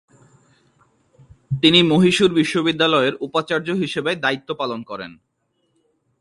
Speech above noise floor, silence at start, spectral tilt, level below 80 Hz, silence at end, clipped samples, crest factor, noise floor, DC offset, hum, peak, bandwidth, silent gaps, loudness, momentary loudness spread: 50 dB; 1.5 s; -5 dB/octave; -58 dBFS; 1.1 s; under 0.1%; 20 dB; -68 dBFS; under 0.1%; none; 0 dBFS; 11.5 kHz; none; -18 LUFS; 16 LU